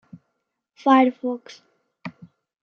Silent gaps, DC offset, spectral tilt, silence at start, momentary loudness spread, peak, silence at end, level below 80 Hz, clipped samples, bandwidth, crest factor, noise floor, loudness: none; under 0.1%; -6 dB/octave; 0.85 s; 23 LU; -4 dBFS; 0.5 s; -80 dBFS; under 0.1%; 6.8 kHz; 20 dB; -78 dBFS; -20 LUFS